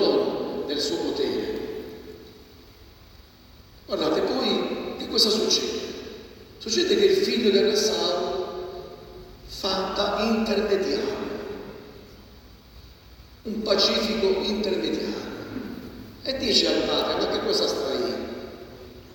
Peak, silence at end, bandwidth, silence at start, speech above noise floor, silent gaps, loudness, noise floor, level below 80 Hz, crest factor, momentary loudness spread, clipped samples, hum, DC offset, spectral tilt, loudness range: -4 dBFS; 0 s; over 20 kHz; 0 s; 27 dB; none; -24 LUFS; -50 dBFS; -52 dBFS; 22 dB; 20 LU; under 0.1%; none; under 0.1%; -3.5 dB/octave; 7 LU